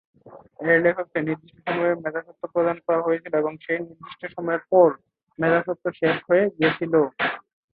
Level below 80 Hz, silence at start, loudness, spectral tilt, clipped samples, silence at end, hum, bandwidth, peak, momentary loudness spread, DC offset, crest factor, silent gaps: -66 dBFS; 0.25 s; -23 LUFS; -10.5 dB/octave; under 0.1%; 0.35 s; none; 4.8 kHz; -4 dBFS; 12 LU; under 0.1%; 20 dB; none